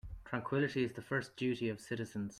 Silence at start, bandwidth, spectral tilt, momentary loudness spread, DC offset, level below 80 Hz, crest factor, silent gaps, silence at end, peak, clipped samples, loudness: 0.05 s; 14 kHz; -6.5 dB/octave; 7 LU; under 0.1%; -58 dBFS; 18 dB; none; 0 s; -20 dBFS; under 0.1%; -38 LUFS